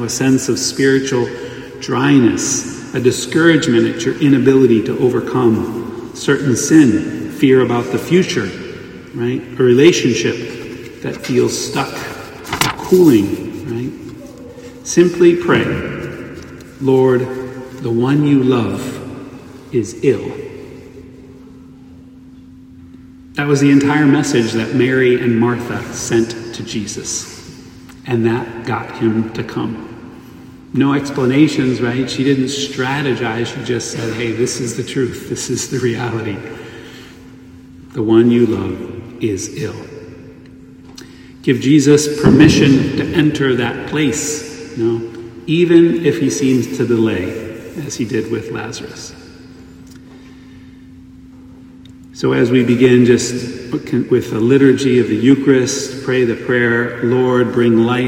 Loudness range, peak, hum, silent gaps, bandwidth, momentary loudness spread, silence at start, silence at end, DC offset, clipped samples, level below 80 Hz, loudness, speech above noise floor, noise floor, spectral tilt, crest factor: 8 LU; 0 dBFS; none; none; 16.5 kHz; 19 LU; 0 s; 0 s; under 0.1%; under 0.1%; -48 dBFS; -15 LUFS; 25 dB; -39 dBFS; -5.5 dB/octave; 16 dB